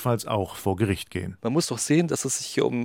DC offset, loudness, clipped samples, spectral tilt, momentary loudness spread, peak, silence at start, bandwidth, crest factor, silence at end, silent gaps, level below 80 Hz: under 0.1%; -26 LUFS; under 0.1%; -5 dB/octave; 6 LU; -8 dBFS; 0 s; 17 kHz; 16 dB; 0 s; none; -58 dBFS